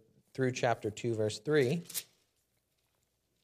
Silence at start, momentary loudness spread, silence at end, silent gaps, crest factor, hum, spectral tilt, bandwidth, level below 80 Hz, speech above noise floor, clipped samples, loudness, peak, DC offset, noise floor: 0.35 s; 10 LU; 1.4 s; none; 20 dB; none; -5 dB/octave; 15 kHz; -76 dBFS; 46 dB; under 0.1%; -33 LUFS; -14 dBFS; under 0.1%; -78 dBFS